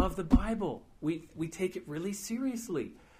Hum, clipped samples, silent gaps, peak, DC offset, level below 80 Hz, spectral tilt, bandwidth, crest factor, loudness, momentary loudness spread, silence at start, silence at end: none; under 0.1%; none; -12 dBFS; under 0.1%; -40 dBFS; -6 dB/octave; 15.5 kHz; 22 dB; -34 LUFS; 9 LU; 0 s; 0.25 s